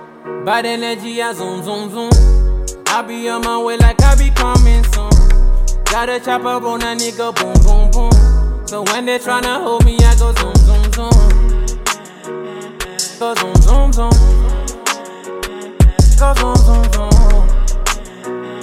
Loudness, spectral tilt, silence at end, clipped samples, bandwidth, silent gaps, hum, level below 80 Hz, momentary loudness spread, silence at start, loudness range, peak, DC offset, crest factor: -14 LUFS; -5 dB/octave; 0 s; under 0.1%; 15 kHz; none; none; -12 dBFS; 12 LU; 0 s; 2 LU; 0 dBFS; under 0.1%; 10 dB